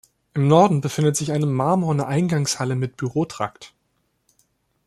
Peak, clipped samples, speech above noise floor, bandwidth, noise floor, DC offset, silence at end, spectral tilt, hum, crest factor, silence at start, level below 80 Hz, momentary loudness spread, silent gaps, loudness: -2 dBFS; under 0.1%; 50 dB; 13.5 kHz; -70 dBFS; under 0.1%; 1.2 s; -6 dB/octave; none; 20 dB; 0.35 s; -60 dBFS; 10 LU; none; -21 LUFS